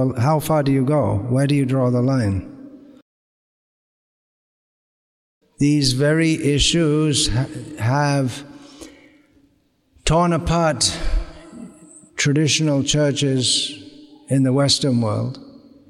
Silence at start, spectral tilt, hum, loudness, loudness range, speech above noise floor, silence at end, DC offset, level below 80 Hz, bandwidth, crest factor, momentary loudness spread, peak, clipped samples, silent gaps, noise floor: 0 s; -5 dB/octave; none; -19 LUFS; 6 LU; 44 dB; 0.4 s; under 0.1%; -36 dBFS; 14.5 kHz; 16 dB; 13 LU; -4 dBFS; under 0.1%; 3.02-5.41 s; -61 dBFS